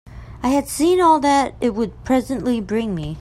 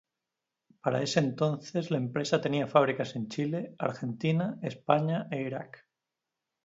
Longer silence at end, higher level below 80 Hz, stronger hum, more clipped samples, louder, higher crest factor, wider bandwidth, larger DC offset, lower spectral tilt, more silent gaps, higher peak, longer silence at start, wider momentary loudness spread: second, 0 s vs 1 s; first, -42 dBFS vs -72 dBFS; neither; neither; first, -19 LUFS vs -30 LUFS; second, 16 dB vs 22 dB; first, 15.5 kHz vs 7.8 kHz; neither; about the same, -5 dB/octave vs -6 dB/octave; neither; first, -4 dBFS vs -8 dBFS; second, 0.1 s vs 0.85 s; about the same, 9 LU vs 9 LU